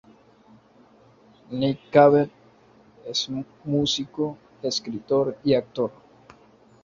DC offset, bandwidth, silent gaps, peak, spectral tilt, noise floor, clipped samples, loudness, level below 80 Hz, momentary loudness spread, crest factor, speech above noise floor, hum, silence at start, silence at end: under 0.1%; 7.6 kHz; none; -4 dBFS; -5 dB/octave; -55 dBFS; under 0.1%; -24 LUFS; -62 dBFS; 14 LU; 22 dB; 32 dB; none; 1.5 s; 0.95 s